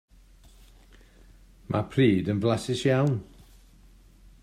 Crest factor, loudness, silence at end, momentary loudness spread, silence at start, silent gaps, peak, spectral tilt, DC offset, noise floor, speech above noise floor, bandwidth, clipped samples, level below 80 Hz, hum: 20 dB; -26 LUFS; 1.2 s; 8 LU; 1.7 s; none; -8 dBFS; -7 dB/octave; under 0.1%; -54 dBFS; 30 dB; 13 kHz; under 0.1%; -54 dBFS; none